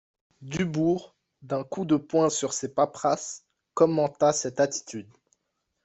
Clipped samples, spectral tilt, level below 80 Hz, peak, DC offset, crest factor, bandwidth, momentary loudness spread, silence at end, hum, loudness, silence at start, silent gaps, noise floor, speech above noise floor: under 0.1%; -5 dB/octave; -66 dBFS; -6 dBFS; under 0.1%; 20 dB; 8.4 kHz; 13 LU; 0.8 s; none; -26 LUFS; 0.4 s; none; -79 dBFS; 53 dB